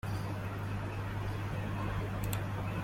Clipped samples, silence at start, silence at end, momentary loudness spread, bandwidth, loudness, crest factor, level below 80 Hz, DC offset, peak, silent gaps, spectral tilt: under 0.1%; 0.05 s; 0 s; 2 LU; 16.5 kHz; -38 LUFS; 20 dB; -48 dBFS; under 0.1%; -16 dBFS; none; -6.5 dB/octave